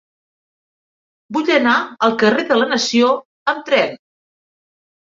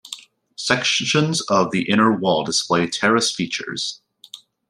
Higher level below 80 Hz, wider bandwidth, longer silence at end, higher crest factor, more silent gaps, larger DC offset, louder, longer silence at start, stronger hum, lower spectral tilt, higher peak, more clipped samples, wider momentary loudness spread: about the same, -64 dBFS vs -62 dBFS; second, 7.8 kHz vs 12.5 kHz; first, 1.1 s vs 0.35 s; about the same, 18 dB vs 18 dB; first, 3.25-3.46 s vs none; neither; first, -16 LUFS vs -19 LUFS; first, 1.3 s vs 0.05 s; neither; about the same, -3.5 dB/octave vs -3.5 dB/octave; about the same, -2 dBFS vs -2 dBFS; neither; about the same, 8 LU vs 10 LU